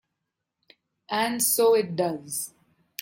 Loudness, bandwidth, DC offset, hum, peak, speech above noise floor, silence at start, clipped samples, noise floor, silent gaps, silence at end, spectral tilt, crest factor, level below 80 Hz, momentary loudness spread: -24 LUFS; 16.5 kHz; under 0.1%; none; -10 dBFS; 59 dB; 1.1 s; under 0.1%; -83 dBFS; none; 0 s; -3 dB/octave; 16 dB; -74 dBFS; 13 LU